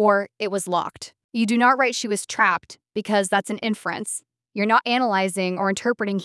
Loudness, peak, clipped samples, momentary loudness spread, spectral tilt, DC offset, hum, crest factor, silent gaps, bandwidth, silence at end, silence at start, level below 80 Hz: -22 LUFS; -4 dBFS; under 0.1%; 13 LU; -4 dB/octave; under 0.1%; none; 18 dB; 1.24-1.29 s; 12 kHz; 0 s; 0 s; -72 dBFS